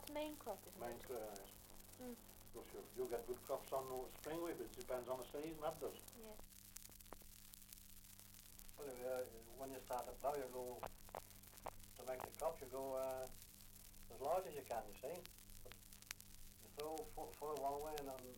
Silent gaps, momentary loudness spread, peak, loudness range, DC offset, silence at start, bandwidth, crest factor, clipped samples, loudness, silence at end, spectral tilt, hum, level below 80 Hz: none; 14 LU; -24 dBFS; 5 LU; under 0.1%; 0 s; 17 kHz; 26 dB; under 0.1%; -50 LUFS; 0 s; -4 dB/octave; none; -66 dBFS